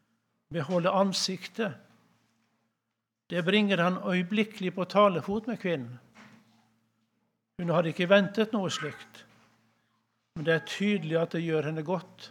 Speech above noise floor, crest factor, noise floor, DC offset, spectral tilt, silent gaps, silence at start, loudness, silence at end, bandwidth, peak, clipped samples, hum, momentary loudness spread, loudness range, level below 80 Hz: 56 dB; 24 dB; -84 dBFS; under 0.1%; -5.5 dB/octave; none; 0.5 s; -28 LUFS; 0 s; 14 kHz; -6 dBFS; under 0.1%; none; 11 LU; 4 LU; -72 dBFS